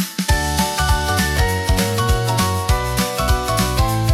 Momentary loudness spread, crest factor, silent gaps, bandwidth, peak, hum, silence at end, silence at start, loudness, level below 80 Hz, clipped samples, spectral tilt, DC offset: 2 LU; 12 dB; none; 17 kHz; -4 dBFS; none; 0 s; 0 s; -18 LUFS; -24 dBFS; under 0.1%; -4 dB/octave; under 0.1%